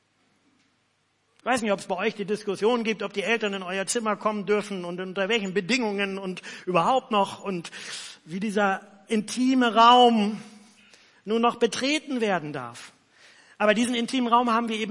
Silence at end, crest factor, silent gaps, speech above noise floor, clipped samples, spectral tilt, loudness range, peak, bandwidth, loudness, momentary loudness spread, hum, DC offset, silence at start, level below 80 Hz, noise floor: 0 s; 20 dB; none; 45 dB; under 0.1%; -4 dB/octave; 5 LU; -6 dBFS; 11.5 kHz; -24 LUFS; 14 LU; none; under 0.1%; 1.45 s; -76 dBFS; -69 dBFS